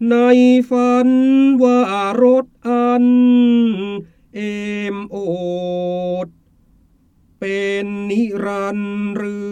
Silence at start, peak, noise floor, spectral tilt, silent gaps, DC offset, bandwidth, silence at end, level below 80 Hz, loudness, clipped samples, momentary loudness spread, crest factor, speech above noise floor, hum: 0 s; -2 dBFS; -54 dBFS; -7 dB/octave; none; under 0.1%; 9 kHz; 0 s; -56 dBFS; -16 LUFS; under 0.1%; 13 LU; 14 dB; 39 dB; none